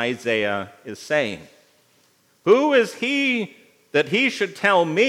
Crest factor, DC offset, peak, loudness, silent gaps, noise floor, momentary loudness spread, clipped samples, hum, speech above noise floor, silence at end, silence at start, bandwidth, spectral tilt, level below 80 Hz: 18 dB; under 0.1%; -4 dBFS; -20 LUFS; none; -60 dBFS; 13 LU; under 0.1%; none; 40 dB; 0 s; 0 s; 15 kHz; -4.5 dB/octave; -72 dBFS